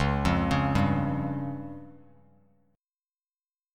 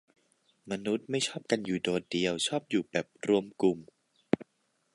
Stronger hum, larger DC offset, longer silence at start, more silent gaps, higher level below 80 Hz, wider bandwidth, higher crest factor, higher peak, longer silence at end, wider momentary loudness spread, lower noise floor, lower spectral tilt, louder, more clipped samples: neither; neither; second, 0 s vs 0.65 s; neither; first, -42 dBFS vs -70 dBFS; about the same, 12 kHz vs 11.5 kHz; second, 18 dB vs 24 dB; about the same, -10 dBFS vs -8 dBFS; first, 1.8 s vs 0.5 s; first, 15 LU vs 5 LU; first, under -90 dBFS vs -75 dBFS; first, -7 dB/octave vs -4.5 dB/octave; first, -27 LUFS vs -31 LUFS; neither